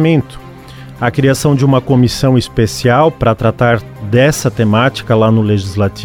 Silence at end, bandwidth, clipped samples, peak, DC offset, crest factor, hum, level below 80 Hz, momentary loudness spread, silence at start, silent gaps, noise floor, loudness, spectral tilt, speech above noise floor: 0 s; 16.5 kHz; under 0.1%; 0 dBFS; under 0.1%; 12 dB; none; -36 dBFS; 6 LU; 0 s; none; -32 dBFS; -12 LUFS; -6.5 dB/octave; 20 dB